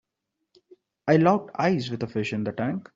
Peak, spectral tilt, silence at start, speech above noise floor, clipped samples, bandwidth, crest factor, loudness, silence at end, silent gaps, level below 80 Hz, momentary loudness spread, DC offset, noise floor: -6 dBFS; -7.5 dB/octave; 1.05 s; 58 dB; under 0.1%; 7.8 kHz; 20 dB; -25 LUFS; 0.15 s; none; -64 dBFS; 10 LU; under 0.1%; -82 dBFS